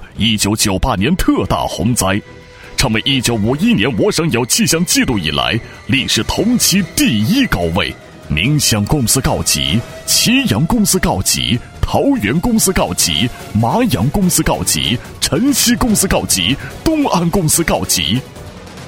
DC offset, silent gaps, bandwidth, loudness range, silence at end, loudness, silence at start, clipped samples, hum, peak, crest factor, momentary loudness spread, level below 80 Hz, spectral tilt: under 0.1%; none; 17.5 kHz; 1 LU; 0 s; -14 LUFS; 0 s; under 0.1%; none; 0 dBFS; 14 dB; 6 LU; -30 dBFS; -3.5 dB/octave